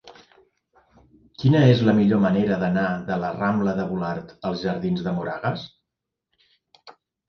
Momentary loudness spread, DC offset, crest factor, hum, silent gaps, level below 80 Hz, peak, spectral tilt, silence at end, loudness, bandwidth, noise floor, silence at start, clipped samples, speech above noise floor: 12 LU; under 0.1%; 20 dB; none; none; -54 dBFS; -2 dBFS; -8.5 dB/octave; 0.4 s; -22 LUFS; 6.4 kHz; -84 dBFS; 0.05 s; under 0.1%; 62 dB